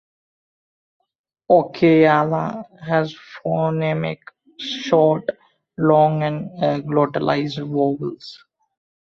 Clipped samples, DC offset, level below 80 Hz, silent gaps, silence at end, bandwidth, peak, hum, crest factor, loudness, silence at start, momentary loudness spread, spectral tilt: under 0.1%; under 0.1%; -60 dBFS; none; 0.65 s; 7 kHz; -2 dBFS; none; 18 dB; -19 LUFS; 1.5 s; 15 LU; -7.5 dB/octave